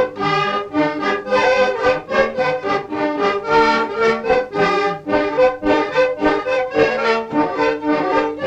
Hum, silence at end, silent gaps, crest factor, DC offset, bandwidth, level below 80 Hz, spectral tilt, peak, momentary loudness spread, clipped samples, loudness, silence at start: none; 0 s; none; 16 dB; under 0.1%; 8.4 kHz; -46 dBFS; -5 dB/octave; -2 dBFS; 4 LU; under 0.1%; -17 LUFS; 0 s